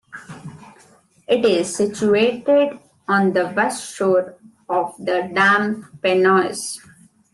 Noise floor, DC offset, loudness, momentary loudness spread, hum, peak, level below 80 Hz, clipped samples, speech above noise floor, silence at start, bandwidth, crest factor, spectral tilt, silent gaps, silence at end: -53 dBFS; under 0.1%; -19 LUFS; 19 LU; none; -4 dBFS; -64 dBFS; under 0.1%; 35 dB; 0.15 s; 12.5 kHz; 16 dB; -4.5 dB/octave; none; 0.55 s